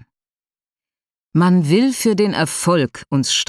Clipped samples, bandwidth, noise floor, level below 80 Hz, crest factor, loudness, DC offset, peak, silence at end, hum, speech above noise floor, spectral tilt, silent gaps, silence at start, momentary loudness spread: under 0.1%; 13.5 kHz; under -90 dBFS; -58 dBFS; 16 dB; -17 LUFS; under 0.1%; -2 dBFS; 0.05 s; none; over 74 dB; -5 dB/octave; none; 1.35 s; 6 LU